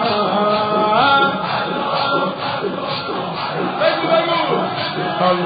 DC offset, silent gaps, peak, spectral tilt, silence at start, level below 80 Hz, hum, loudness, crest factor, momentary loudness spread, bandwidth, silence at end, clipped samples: under 0.1%; none; -4 dBFS; -10 dB/octave; 0 s; -58 dBFS; none; -17 LUFS; 14 dB; 8 LU; 5 kHz; 0 s; under 0.1%